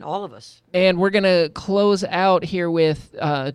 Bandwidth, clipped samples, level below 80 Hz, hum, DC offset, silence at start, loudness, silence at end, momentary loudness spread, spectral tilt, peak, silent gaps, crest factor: 11 kHz; under 0.1%; -54 dBFS; none; under 0.1%; 0 s; -19 LUFS; 0 s; 9 LU; -6 dB/octave; -6 dBFS; none; 14 dB